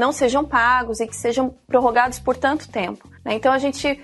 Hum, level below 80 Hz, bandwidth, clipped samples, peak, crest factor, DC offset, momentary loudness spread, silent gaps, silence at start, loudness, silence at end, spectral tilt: none; -46 dBFS; 12 kHz; under 0.1%; -2 dBFS; 16 dB; under 0.1%; 10 LU; none; 0 s; -20 LUFS; 0 s; -3.5 dB/octave